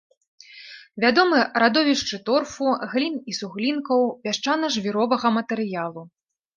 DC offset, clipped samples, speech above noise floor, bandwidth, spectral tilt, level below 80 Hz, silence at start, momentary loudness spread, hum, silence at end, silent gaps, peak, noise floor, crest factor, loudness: under 0.1%; under 0.1%; 22 dB; 9.4 kHz; -4 dB/octave; -66 dBFS; 0.5 s; 13 LU; none; 0.5 s; none; -2 dBFS; -44 dBFS; 20 dB; -22 LUFS